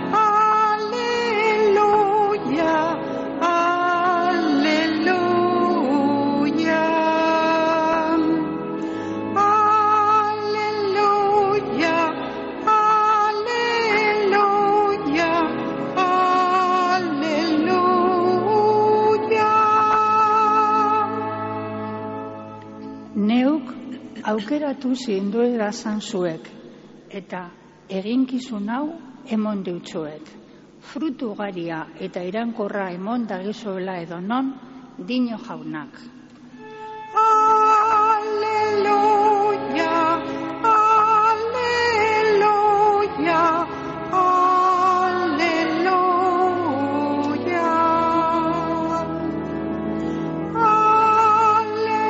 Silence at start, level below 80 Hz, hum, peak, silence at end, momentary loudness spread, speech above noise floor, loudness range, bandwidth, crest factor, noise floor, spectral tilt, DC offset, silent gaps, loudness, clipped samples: 0 s; -56 dBFS; none; -6 dBFS; 0 s; 13 LU; 18 dB; 10 LU; 8 kHz; 14 dB; -43 dBFS; -3.5 dB/octave; under 0.1%; none; -19 LUFS; under 0.1%